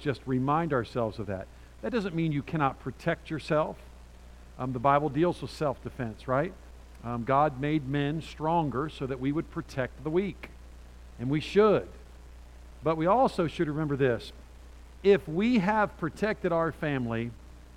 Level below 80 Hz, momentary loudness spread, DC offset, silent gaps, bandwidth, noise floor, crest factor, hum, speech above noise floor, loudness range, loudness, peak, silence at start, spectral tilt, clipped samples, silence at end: -50 dBFS; 12 LU; under 0.1%; none; 14 kHz; -49 dBFS; 20 dB; none; 21 dB; 4 LU; -29 LUFS; -10 dBFS; 0 s; -7.5 dB/octave; under 0.1%; 0 s